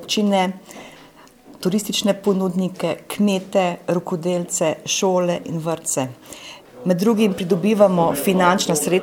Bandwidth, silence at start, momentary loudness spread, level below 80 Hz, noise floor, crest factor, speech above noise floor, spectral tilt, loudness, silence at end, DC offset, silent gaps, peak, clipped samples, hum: 19.5 kHz; 0 s; 12 LU; -60 dBFS; -46 dBFS; 18 dB; 27 dB; -4.5 dB/octave; -20 LUFS; 0 s; under 0.1%; none; -2 dBFS; under 0.1%; none